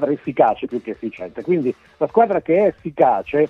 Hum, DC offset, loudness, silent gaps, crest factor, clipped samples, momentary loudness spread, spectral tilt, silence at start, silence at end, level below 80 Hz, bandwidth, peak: none; under 0.1%; -19 LUFS; none; 16 dB; under 0.1%; 13 LU; -9 dB/octave; 0 s; 0 s; -56 dBFS; 5.8 kHz; -2 dBFS